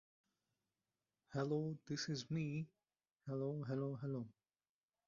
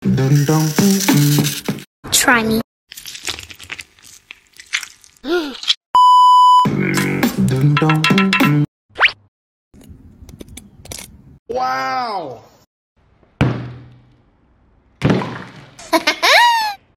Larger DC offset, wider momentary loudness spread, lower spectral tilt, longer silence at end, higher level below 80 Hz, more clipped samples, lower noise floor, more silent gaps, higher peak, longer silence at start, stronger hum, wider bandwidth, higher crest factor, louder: neither; second, 7 LU vs 21 LU; first, -6.5 dB/octave vs -4 dB/octave; first, 0.75 s vs 0.2 s; second, -80 dBFS vs -46 dBFS; neither; first, under -90 dBFS vs -54 dBFS; second, 3.11-3.16 s vs 1.87-2.03 s, 2.64-2.87 s, 5.77-5.94 s, 8.68-8.89 s, 9.28-9.71 s, 11.39-11.46 s, 12.67-12.95 s; second, -30 dBFS vs 0 dBFS; first, 1.3 s vs 0 s; neither; second, 7.2 kHz vs 17 kHz; about the same, 16 dB vs 16 dB; second, -44 LUFS vs -14 LUFS